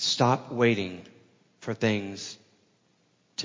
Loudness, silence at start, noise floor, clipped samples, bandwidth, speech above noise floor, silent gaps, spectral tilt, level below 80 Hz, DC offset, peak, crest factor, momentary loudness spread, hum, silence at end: -27 LUFS; 0 s; -68 dBFS; under 0.1%; 7.6 kHz; 41 dB; none; -4.5 dB/octave; -64 dBFS; under 0.1%; -8 dBFS; 20 dB; 17 LU; none; 0 s